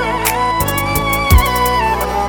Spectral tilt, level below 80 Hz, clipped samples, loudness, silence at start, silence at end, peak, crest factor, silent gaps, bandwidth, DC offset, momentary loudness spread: -4 dB/octave; -20 dBFS; under 0.1%; -14 LUFS; 0 s; 0 s; 0 dBFS; 14 dB; none; over 20 kHz; under 0.1%; 4 LU